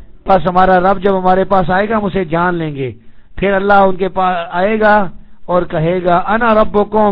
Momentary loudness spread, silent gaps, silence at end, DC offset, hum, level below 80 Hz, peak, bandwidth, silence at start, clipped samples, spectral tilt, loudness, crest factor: 7 LU; none; 0 s; under 0.1%; none; -32 dBFS; 0 dBFS; 5.4 kHz; 0 s; 0.3%; -9.5 dB/octave; -13 LUFS; 12 dB